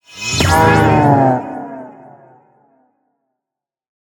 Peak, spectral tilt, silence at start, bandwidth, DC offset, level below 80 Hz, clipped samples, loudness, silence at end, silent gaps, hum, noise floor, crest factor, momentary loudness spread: 0 dBFS; -5 dB/octave; 0.15 s; 19.5 kHz; under 0.1%; -38 dBFS; under 0.1%; -12 LUFS; 2.2 s; none; none; -86 dBFS; 16 dB; 19 LU